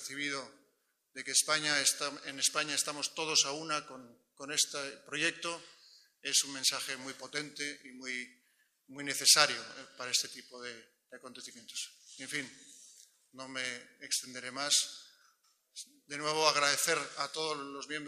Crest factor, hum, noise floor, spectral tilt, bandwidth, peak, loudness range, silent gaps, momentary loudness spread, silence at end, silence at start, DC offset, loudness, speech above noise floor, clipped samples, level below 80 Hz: 30 dB; none; -77 dBFS; 0 dB/octave; 15.5 kHz; -6 dBFS; 9 LU; none; 21 LU; 0 s; 0 s; under 0.1%; -32 LUFS; 42 dB; under 0.1%; -86 dBFS